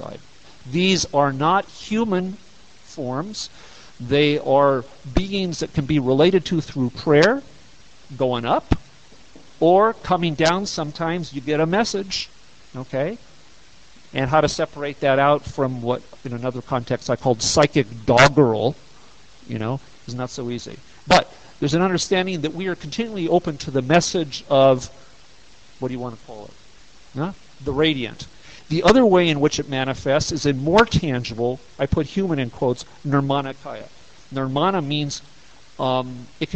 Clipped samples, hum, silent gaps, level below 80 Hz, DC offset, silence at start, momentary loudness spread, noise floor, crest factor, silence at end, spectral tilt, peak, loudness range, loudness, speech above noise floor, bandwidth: under 0.1%; none; none; -42 dBFS; 0.6%; 0 s; 16 LU; -51 dBFS; 20 dB; 0 s; -5 dB/octave; 0 dBFS; 5 LU; -20 LUFS; 31 dB; 9 kHz